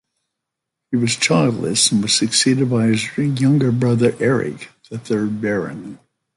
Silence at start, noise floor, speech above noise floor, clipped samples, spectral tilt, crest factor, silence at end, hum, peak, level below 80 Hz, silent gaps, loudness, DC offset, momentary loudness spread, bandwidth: 0.9 s; -81 dBFS; 63 dB; under 0.1%; -4.5 dB/octave; 16 dB; 0.4 s; none; -2 dBFS; -56 dBFS; none; -17 LUFS; under 0.1%; 14 LU; 11.5 kHz